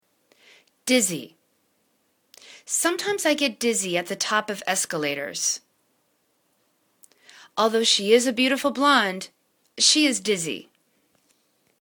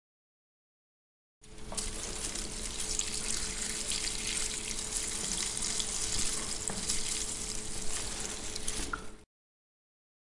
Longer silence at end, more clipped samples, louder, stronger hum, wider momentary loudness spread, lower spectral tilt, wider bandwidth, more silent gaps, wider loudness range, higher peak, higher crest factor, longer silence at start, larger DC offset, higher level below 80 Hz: first, 1.2 s vs 1.05 s; neither; first, -22 LUFS vs -34 LUFS; neither; first, 13 LU vs 6 LU; about the same, -1.5 dB/octave vs -1 dB/octave; first, 19 kHz vs 11.5 kHz; neither; about the same, 7 LU vs 5 LU; first, -4 dBFS vs -12 dBFS; about the same, 22 dB vs 24 dB; second, 0.85 s vs 1.4 s; neither; second, -74 dBFS vs -46 dBFS